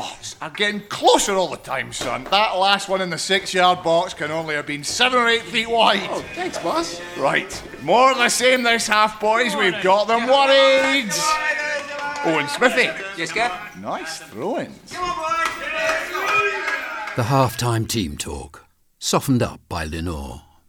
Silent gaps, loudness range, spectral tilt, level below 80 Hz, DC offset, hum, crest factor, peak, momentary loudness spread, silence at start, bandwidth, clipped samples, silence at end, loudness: none; 6 LU; -3 dB/octave; -48 dBFS; under 0.1%; none; 18 dB; -2 dBFS; 13 LU; 0 s; 19.5 kHz; under 0.1%; 0.3 s; -19 LUFS